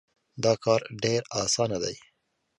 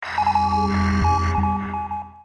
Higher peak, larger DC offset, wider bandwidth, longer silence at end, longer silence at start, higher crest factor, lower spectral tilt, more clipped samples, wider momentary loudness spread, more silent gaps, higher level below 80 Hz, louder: about the same, -8 dBFS vs -8 dBFS; neither; first, 11.5 kHz vs 9.4 kHz; first, 0.6 s vs 0 s; first, 0.35 s vs 0 s; first, 20 dB vs 12 dB; second, -3.5 dB/octave vs -6.5 dB/octave; neither; about the same, 8 LU vs 8 LU; neither; second, -62 dBFS vs -32 dBFS; second, -27 LUFS vs -21 LUFS